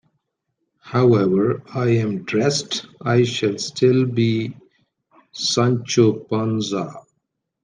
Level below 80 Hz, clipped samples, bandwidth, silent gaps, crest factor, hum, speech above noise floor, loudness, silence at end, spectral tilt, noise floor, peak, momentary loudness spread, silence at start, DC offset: -62 dBFS; under 0.1%; 9.8 kHz; none; 18 dB; none; 57 dB; -20 LUFS; 0.65 s; -5.5 dB/octave; -75 dBFS; -2 dBFS; 8 LU; 0.85 s; under 0.1%